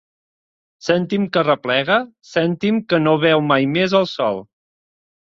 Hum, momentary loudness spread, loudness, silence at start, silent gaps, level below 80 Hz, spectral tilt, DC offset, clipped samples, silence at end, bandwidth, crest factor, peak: none; 7 LU; -18 LUFS; 0.85 s; none; -60 dBFS; -6.5 dB/octave; under 0.1%; under 0.1%; 0.9 s; 7.6 kHz; 18 dB; -2 dBFS